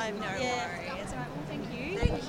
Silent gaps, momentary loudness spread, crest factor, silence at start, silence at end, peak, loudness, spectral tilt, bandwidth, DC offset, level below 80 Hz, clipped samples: none; 6 LU; 22 dB; 0 s; 0 s; -10 dBFS; -34 LUFS; -5 dB/octave; 16 kHz; under 0.1%; -42 dBFS; under 0.1%